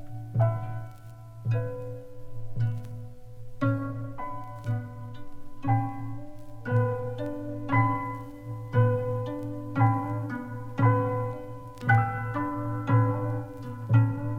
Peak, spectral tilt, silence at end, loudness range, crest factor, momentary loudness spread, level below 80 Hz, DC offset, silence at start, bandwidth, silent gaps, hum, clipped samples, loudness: -10 dBFS; -9.5 dB/octave; 0 s; 7 LU; 18 dB; 18 LU; -50 dBFS; under 0.1%; 0 s; 4 kHz; none; none; under 0.1%; -29 LUFS